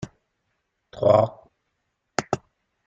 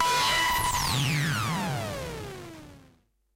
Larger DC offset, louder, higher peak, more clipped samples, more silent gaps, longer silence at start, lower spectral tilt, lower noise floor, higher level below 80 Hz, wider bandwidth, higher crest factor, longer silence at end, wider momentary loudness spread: neither; first, -23 LUFS vs -26 LUFS; first, -4 dBFS vs -12 dBFS; neither; neither; about the same, 0 s vs 0 s; first, -6 dB/octave vs -3 dB/octave; first, -76 dBFS vs -63 dBFS; second, -60 dBFS vs -46 dBFS; second, 8.6 kHz vs 16 kHz; first, 22 dB vs 16 dB; about the same, 0.5 s vs 0.55 s; second, 13 LU vs 19 LU